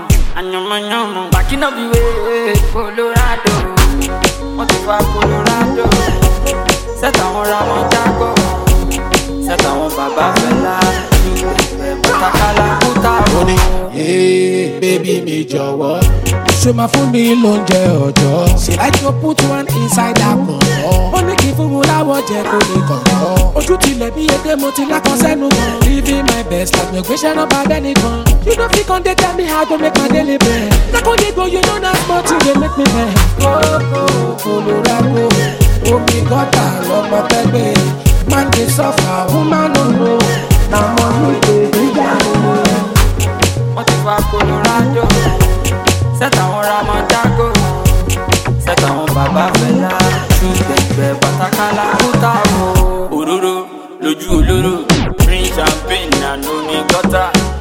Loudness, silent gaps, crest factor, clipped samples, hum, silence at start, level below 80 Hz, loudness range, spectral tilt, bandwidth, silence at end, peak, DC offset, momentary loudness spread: -12 LUFS; none; 12 dB; under 0.1%; none; 0 s; -20 dBFS; 2 LU; -5 dB/octave; 17 kHz; 0 s; 0 dBFS; under 0.1%; 4 LU